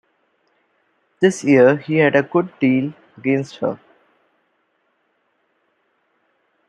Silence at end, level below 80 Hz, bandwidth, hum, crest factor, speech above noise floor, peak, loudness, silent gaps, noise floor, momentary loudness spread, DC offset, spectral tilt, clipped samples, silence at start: 2.95 s; -66 dBFS; 10.5 kHz; none; 20 dB; 50 dB; -2 dBFS; -17 LUFS; none; -67 dBFS; 13 LU; under 0.1%; -6.5 dB/octave; under 0.1%; 1.2 s